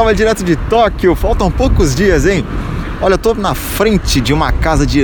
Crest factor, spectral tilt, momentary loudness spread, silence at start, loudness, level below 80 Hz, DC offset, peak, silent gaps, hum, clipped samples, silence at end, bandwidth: 12 dB; -5.5 dB/octave; 5 LU; 0 s; -13 LUFS; -18 dBFS; under 0.1%; 0 dBFS; none; none; under 0.1%; 0 s; over 20 kHz